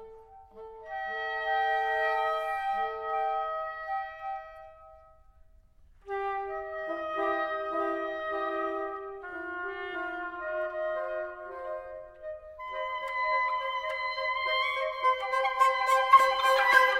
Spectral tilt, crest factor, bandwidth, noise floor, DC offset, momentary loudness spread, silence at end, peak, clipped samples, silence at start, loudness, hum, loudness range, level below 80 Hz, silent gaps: -2 dB/octave; 24 dB; 16 kHz; -58 dBFS; under 0.1%; 16 LU; 0 s; -8 dBFS; under 0.1%; 0 s; -29 LUFS; none; 10 LU; -62 dBFS; none